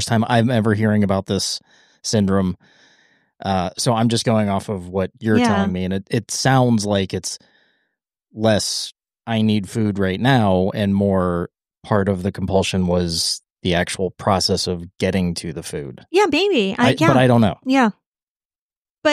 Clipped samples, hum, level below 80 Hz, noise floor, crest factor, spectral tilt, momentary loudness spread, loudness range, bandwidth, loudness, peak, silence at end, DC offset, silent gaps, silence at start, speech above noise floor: under 0.1%; none; -50 dBFS; under -90 dBFS; 18 dB; -5 dB/octave; 9 LU; 4 LU; 15 kHz; -19 LUFS; -2 dBFS; 0 s; under 0.1%; 18.06-18.12 s, 18.23-18.36 s, 18.45-18.50 s, 18.58-18.70 s, 18.77-18.83 s, 18.90-19.02 s; 0 s; over 72 dB